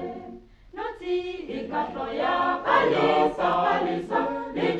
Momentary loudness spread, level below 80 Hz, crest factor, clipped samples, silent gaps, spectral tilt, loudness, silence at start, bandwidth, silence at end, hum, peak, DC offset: 14 LU; -54 dBFS; 20 dB; under 0.1%; none; -6 dB/octave; -25 LUFS; 0 s; 8.8 kHz; 0 s; none; -6 dBFS; under 0.1%